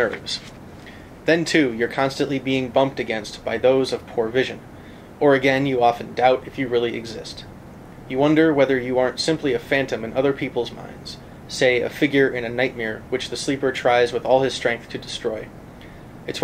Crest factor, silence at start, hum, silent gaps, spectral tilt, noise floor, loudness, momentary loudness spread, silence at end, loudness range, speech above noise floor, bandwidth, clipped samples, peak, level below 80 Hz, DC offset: 18 dB; 0 s; none; none; -5 dB/octave; -41 dBFS; -21 LUFS; 21 LU; 0 s; 2 LU; 20 dB; 15.5 kHz; under 0.1%; -4 dBFS; -50 dBFS; under 0.1%